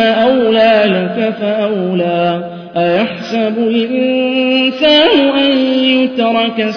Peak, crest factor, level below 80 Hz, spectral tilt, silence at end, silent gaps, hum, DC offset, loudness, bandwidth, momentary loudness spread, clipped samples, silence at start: 0 dBFS; 12 dB; -52 dBFS; -6.5 dB/octave; 0 s; none; none; under 0.1%; -12 LUFS; 5.4 kHz; 7 LU; under 0.1%; 0 s